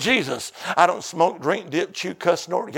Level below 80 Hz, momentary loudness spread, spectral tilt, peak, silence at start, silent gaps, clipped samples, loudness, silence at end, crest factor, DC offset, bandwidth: -66 dBFS; 8 LU; -3.5 dB/octave; 0 dBFS; 0 s; none; under 0.1%; -22 LUFS; 0 s; 22 dB; under 0.1%; 17 kHz